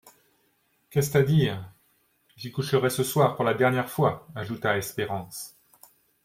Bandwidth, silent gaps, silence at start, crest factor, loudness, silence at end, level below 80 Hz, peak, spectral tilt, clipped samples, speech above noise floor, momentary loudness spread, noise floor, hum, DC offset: 16.5 kHz; none; 0.05 s; 20 dB; -26 LUFS; 0.75 s; -60 dBFS; -8 dBFS; -5.5 dB/octave; under 0.1%; 44 dB; 15 LU; -69 dBFS; none; under 0.1%